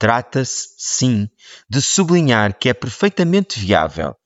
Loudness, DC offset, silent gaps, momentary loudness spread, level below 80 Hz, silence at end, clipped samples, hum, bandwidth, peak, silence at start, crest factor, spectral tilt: -17 LUFS; under 0.1%; none; 9 LU; -48 dBFS; 0.15 s; under 0.1%; none; 8 kHz; -2 dBFS; 0 s; 16 dB; -4.5 dB/octave